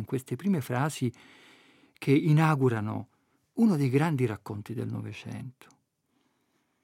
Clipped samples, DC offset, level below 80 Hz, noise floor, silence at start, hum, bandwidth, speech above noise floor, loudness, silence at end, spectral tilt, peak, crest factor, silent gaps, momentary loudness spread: under 0.1%; under 0.1%; -76 dBFS; -74 dBFS; 0 s; none; 16 kHz; 46 dB; -28 LUFS; 1.3 s; -7.5 dB/octave; -10 dBFS; 20 dB; none; 16 LU